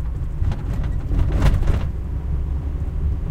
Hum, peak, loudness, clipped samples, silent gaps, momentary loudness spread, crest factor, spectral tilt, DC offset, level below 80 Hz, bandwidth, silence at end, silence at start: none; -4 dBFS; -24 LUFS; under 0.1%; none; 7 LU; 16 dB; -8 dB/octave; under 0.1%; -22 dBFS; 9 kHz; 0 s; 0 s